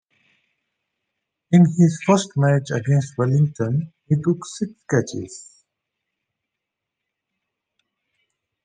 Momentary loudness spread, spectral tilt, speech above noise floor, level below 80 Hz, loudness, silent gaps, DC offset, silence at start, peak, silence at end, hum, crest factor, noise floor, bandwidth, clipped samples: 14 LU; -7 dB/octave; 64 dB; -64 dBFS; -20 LUFS; none; under 0.1%; 1.5 s; -2 dBFS; 3.25 s; none; 20 dB; -83 dBFS; 9.6 kHz; under 0.1%